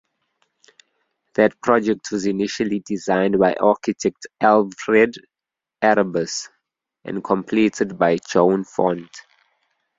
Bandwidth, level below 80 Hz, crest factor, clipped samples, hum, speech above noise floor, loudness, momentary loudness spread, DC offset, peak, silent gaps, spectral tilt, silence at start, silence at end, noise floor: 7.8 kHz; -60 dBFS; 20 dB; under 0.1%; none; 67 dB; -20 LUFS; 11 LU; under 0.1%; -2 dBFS; none; -5 dB/octave; 1.4 s; 0.8 s; -86 dBFS